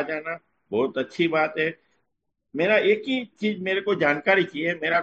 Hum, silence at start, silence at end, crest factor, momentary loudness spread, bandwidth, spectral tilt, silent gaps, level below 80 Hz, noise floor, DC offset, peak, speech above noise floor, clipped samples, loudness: none; 0 s; 0 s; 18 dB; 10 LU; 7.8 kHz; -6 dB/octave; none; -70 dBFS; -79 dBFS; under 0.1%; -6 dBFS; 55 dB; under 0.1%; -24 LUFS